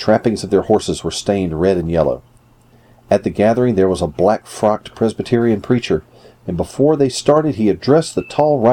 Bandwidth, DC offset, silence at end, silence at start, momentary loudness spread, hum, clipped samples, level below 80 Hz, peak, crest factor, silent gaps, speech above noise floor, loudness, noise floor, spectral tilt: 14.5 kHz; under 0.1%; 0 s; 0 s; 7 LU; none; under 0.1%; -42 dBFS; 0 dBFS; 14 dB; none; 34 dB; -16 LUFS; -49 dBFS; -6 dB/octave